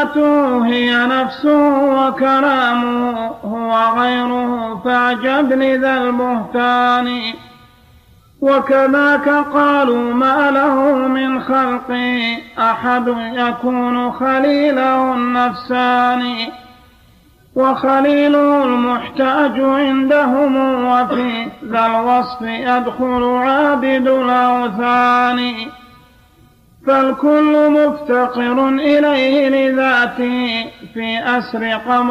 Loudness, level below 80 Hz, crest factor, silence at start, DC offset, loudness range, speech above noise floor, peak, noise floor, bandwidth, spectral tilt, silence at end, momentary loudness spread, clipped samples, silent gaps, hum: -14 LUFS; -52 dBFS; 12 dB; 0 s; under 0.1%; 3 LU; 34 dB; -2 dBFS; -48 dBFS; 12 kHz; -5.5 dB/octave; 0 s; 7 LU; under 0.1%; none; none